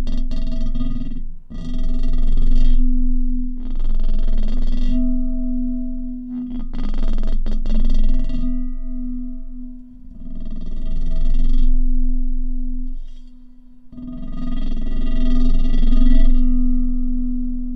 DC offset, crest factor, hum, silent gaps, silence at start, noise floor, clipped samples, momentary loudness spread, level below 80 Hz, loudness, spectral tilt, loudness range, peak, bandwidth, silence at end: under 0.1%; 12 dB; none; none; 0 s; -39 dBFS; under 0.1%; 13 LU; -16 dBFS; -25 LUFS; -8.5 dB/octave; 6 LU; -2 dBFS; 3.7 kHz; 0 s